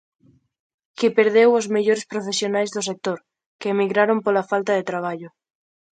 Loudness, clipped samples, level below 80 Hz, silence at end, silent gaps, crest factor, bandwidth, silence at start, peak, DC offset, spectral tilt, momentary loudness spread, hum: -21 LUFS; under 0.1%; -72 dBFS; 0.7 s; 3.46-3.59 s; 20 dB; 9.4 kHz; 1 s; -2 dBFS; under 0.1%; -4 dB/octave; 12 LU; none